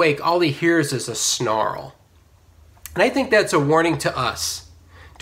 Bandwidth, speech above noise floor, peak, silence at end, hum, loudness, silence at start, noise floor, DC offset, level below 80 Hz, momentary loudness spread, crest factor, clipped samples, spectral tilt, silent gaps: 16 kHz; 33 dB; -4 dBFS; 0.15 s; none; -19 LUFS; 0 s; -53 dBFS; under 0.1%; -50 dBFS; 10 LU; 18 dB; under 0.1%; -4 dB/octave; none